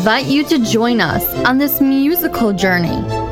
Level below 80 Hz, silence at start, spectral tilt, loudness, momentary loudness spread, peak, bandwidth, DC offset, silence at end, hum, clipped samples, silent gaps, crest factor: -38 dBFS; 0 s; -5 dB/octave; -14 LUFS; 3 LU; -2 dBFS; 17.5 kHz; under 0.1%; 0 s; none; under 0.1%; none; 14 dB